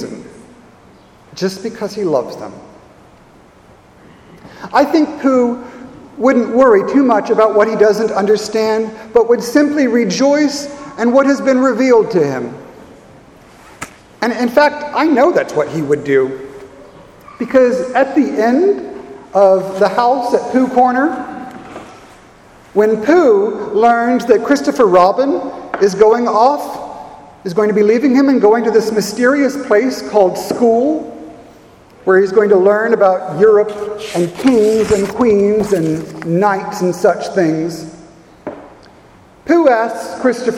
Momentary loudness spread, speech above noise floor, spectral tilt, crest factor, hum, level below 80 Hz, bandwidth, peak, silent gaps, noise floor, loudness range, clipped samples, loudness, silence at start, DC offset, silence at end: 17 LU; 31 dB; -5.5 dB/octave; 14 dB; none; -50 dBFS; 15 kHz; 0 dBFS; none; -44 dBFS; 6 LU; under 0.1%; -13 LUFS; 0 s; under 0.1%; 0 s